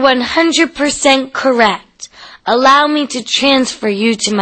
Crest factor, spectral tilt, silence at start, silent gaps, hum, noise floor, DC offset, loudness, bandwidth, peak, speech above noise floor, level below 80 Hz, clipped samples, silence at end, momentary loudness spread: 12 dB; -2.5 dB/octave; 0 s; none; none; -35 dBFS; under 0.1%; -12 LUFS; 8.8 kHz; 0 dBFS; 23 dB; -48 dBFS; under 0.1%; 0 s; 15 LU